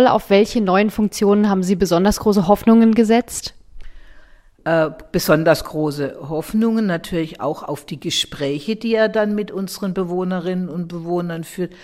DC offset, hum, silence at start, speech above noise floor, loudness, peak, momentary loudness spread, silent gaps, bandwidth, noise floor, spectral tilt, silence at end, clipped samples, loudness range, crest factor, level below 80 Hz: under 0.1%; none; 0 s; 27 dB; -18 LUFS; -2 dBFS; 12 LU; none; 16 kHz; -45 dBFS; -5.5 dB/octave; 0.1 s; under 0.1%; 6 LU; 16 dB; -44 dBFS